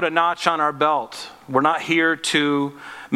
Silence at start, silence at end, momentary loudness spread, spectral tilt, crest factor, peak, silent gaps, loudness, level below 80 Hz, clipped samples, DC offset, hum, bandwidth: 0 s; 0 s; 11 LU; -4 dB/octave; 20 dB; 0 dBFS; none; -20 LUFS; -68 dBFS; under 0.1%; under 0.1%; none; 15 kHz